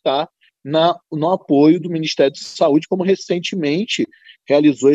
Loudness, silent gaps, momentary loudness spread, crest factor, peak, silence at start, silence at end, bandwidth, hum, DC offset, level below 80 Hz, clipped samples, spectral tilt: -17 LUFS; none; 8 LU; 16 dB; -2 dBFS; 0.05 s; 0 s; 8 kHz; none; under 0.1%; -70 dBFS; under 0.1%; -5.5 dB/octave